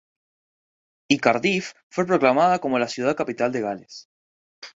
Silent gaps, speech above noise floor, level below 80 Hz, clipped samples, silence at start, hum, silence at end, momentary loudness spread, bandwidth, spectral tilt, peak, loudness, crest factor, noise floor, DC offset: 1.83-1.90 s, 4.05-4.62 s; over 68 dB; -66 dBFS; under 0.1%; 1.1 s; none; 0.1 s; 12 LU; 8 kHz; -5 dB/octave; -2 dBFS; -22 LUFS; 22 dB; under -90 dBFS; under 0.1%